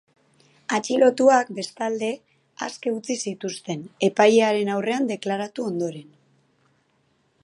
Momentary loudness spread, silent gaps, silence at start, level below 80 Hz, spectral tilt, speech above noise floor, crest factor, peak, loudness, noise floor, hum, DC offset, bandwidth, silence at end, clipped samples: 15 LU; none; 0.7 s; -78 dBFS; -4.5 dB/octave; 44 dB; 22 dB; -2 dBFS; -23 LUFS; -66 dBFS; none; under 0.1%; 11.5 kHz; 1.4 s; under 0.1%